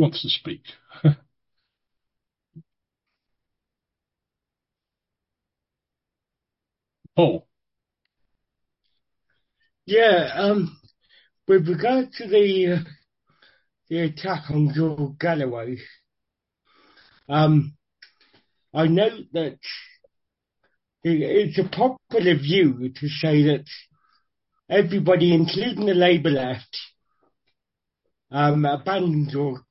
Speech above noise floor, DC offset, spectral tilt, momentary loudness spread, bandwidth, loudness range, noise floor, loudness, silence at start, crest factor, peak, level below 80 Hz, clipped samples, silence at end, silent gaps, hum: 66 dB; under 0.1%; -10 dB/octave; 14 LU; 5.8 kHz; 8 LU; -87 dBFS; -21 LUFS; 0 s; 20 dB; -4 dBFS; -64 dBFS; under 0.1%; 0.1 s; none; none